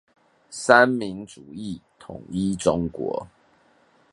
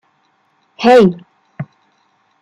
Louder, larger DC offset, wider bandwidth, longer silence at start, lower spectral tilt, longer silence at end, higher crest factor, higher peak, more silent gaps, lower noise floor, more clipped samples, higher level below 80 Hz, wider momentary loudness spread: second, -22 LUFS vs -11 LUFS; neither; about the same, 11.5 kHz vs 10.5 kHz; second, 0.5 s vs 0.8 s; second, -5 dB/octave vs -7 dB/octave; about the same, 0.85 s vs 0.8 s; first, 24 dB vs 14 dB; about the same, 0 dBFS vs -2 dBFS; neither; about the same, -60 dBFS vs -59 dBFS; neither; about the same, -52 dBFS vs -56 dBFS; about the same, 23 LU vs 23 LU